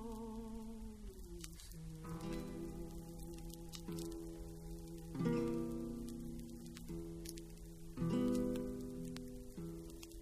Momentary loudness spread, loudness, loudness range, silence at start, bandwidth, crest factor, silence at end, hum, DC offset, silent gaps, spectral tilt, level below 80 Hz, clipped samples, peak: 14 LU; -46 LUFS; 6 LU; 0 s; 15.5 kHz; 22 dB; 0 s; none; under 0.1%; none; -6.5 dB/octave; -54 dBFS; under 0.1%; -24 dBFS